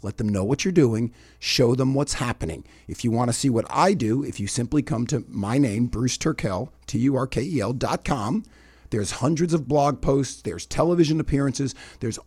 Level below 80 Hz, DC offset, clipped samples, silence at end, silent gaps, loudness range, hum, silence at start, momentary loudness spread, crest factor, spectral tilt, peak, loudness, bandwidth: -42 dBFS; under 0.1%; under 0.1%; 0.05 s; none; 2 LU; none; 0.05 s; 10 LU; 18 dB; -5.5 dB/octave; -6 dBFS; -24 LUFS; 15 kHz